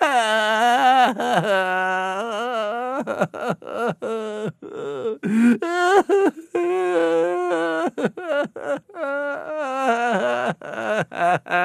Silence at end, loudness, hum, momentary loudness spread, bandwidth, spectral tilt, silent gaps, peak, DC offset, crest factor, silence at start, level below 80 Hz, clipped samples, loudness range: 0 s; -21 LUFS; none; 10 LU; 14 kHz; -4.5 dB/octave; none; -4 dBFS; under 0.1%; 18 dB; 0 s; -74 dBFS; under 0.1%; 4 LU